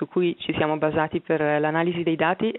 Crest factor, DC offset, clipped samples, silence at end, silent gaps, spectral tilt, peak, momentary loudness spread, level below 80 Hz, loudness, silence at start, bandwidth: 16 dB; under 0.1%; under 0.1%; 0 s; none; -4.5 dB/octave; -6 dBFS; 3 LU; -58 dBFS; -23 LUFS; 0 s; 4.1 kHz